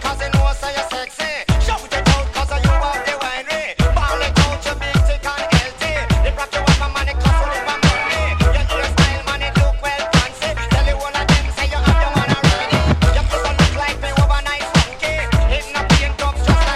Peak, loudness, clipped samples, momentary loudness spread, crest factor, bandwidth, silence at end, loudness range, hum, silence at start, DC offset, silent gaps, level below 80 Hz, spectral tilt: 0 dBFS; -17 LUFS; under 0.1%; 6 LU; 16 dB; 14 kHz; 0 s; 2 LU; none; 0 s; under 0.1%; none; -20 dBFS; -5 dB/octave